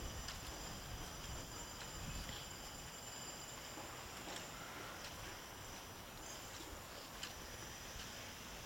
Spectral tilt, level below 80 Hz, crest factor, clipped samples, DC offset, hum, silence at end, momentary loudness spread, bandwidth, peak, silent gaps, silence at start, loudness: -2.5 dB/octave; -58 dBFS; 20 dB; under 0.1%; under 0.1%; none; 0 s; 3 LU; 17 kHz; -30 dBFS; none; 0 s; -49 LUFS